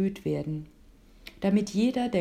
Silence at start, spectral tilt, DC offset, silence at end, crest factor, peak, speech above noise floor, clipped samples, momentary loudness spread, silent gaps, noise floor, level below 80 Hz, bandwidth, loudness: 0 s; -7 dB/octave; under 0.1%; 0 s; 14 dB; -14 dBFS; 27 dB; under 0.1%; 18 LU; none; -54 dBFS; -56 dBFS; 14 kHz; -28 LUFS